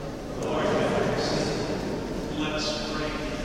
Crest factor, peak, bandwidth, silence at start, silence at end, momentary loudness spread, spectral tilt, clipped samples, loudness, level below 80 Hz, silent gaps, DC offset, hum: 14 dB; -14 dBFS; 16 kHz; 0 s; 0 s; 7 LU; -5 dB/octave; under 0.1%; -28 LUFS; -42 dBFS; none; 0.1%; none